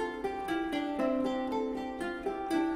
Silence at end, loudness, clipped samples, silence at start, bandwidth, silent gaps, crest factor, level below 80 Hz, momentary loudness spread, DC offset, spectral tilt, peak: 0 s; -34 LUFS; under 0.1%; 0 s; 15.5 kHz; none; 14 dB; -58 dBFS; 5 LU; under 0.1%; -5 dB/octave; -20 dBFS